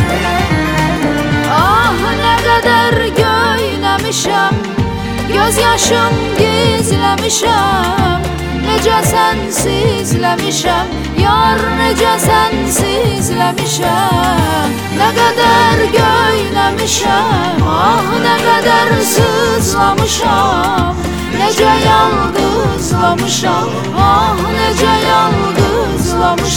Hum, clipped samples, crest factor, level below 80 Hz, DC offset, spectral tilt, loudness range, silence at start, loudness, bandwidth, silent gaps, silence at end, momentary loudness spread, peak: none; under 0.1%; 12 dB; -28 dBFS; under 0.1%; -4 dB/octave; 1 LU; 0 s; -11 LUFS; 18 kHz; none; 0 s; 5 LU; 0 dBFS